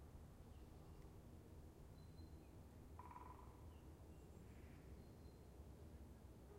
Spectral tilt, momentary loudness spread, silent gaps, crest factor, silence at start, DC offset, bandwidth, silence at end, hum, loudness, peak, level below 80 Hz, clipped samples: -6.5 dB/octave; 3 LU; none; 14 dB; 0 s; under 0.1%; 16 kHz; 0 s; none; -62 LUFS; -46 dBFS; -64 dBFS; under 0.1%